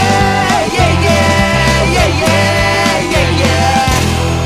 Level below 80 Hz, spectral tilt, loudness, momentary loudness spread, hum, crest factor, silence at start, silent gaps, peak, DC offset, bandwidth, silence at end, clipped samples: -22 dBFS; -4.5 dB/octave; -11 LUFS; 2 LU; none; 10 dB; 0 s; none; 0 dBFS; under 0.1%; 16 kHz; 0 s; under 0.1%